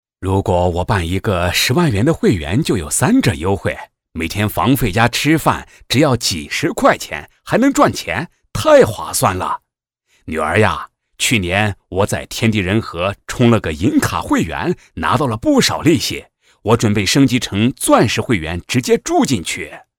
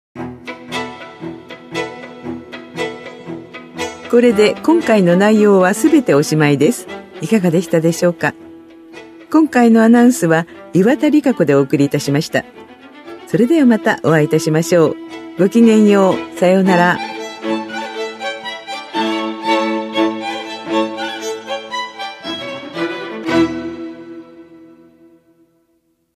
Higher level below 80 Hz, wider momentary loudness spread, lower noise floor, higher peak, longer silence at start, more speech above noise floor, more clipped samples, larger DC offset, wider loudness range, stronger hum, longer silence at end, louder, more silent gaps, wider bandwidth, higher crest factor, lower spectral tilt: first, -38 dBFS vs -58 dBFS; second, 9 LU vs 19 LU; first, -66 dBFS vs -62 dBFS; about the same, 0 dBFS vs 0 dBFS; about the same, 0.2 s vs 0.15 s; about the same, 51 dB vs 50 dB; neither; neither; second, 2 LU vs 10 LU; neither; second, 0.2 s vs 1.75 s; about the same, -16 LUFS vs -15 LUFS; neither; first, 18 kHz vs 14.5 kHz; about the same, 16 dB vs 16 dB; about the same, -5 dB/octave vs -6 dB/octave